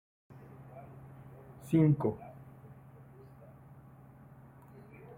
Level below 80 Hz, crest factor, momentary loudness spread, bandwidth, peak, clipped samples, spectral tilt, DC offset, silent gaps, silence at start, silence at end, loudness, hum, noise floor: -66 dBFS; 22 dB; 28 LU; 15 kHz; -16 dBFS; under 0.1%; -10 dB/octave; under 0.1%; none; 0.6 s; 2.45 s; -30 LUFS; none; -55 dBFS